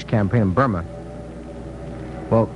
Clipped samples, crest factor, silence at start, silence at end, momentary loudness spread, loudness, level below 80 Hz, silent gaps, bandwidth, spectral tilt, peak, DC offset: under 0.1%; 18 dB; 0 s; 0 s; 16 LU; -21 LUFS; -40 dBFS; none; 10 kHz; -9 dB/octave; -4 dBFS; under 0.1%